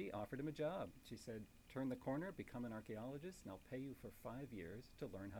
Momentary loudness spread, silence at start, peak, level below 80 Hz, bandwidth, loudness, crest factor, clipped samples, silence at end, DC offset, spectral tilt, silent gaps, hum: 9 LU; 0 s; -34 dBFS; -68 dBFS; over 20 kHz; -50 LUFS; 16 dB; under 0.1%; 0 s; under 0.1%; -7 dB/octave; none; none